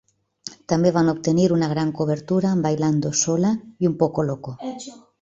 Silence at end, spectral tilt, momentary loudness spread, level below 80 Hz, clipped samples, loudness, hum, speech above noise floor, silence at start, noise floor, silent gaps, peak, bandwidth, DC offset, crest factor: 0.25 s; -6 dB/octave; 15 LU; -58 dBFS; under 0.1%; -21 LUFS; none; 21 dB; 0.45 s; -42 dBFS; none; -4 dBFS; 7.8 kHz; under 0.1%; 18 dB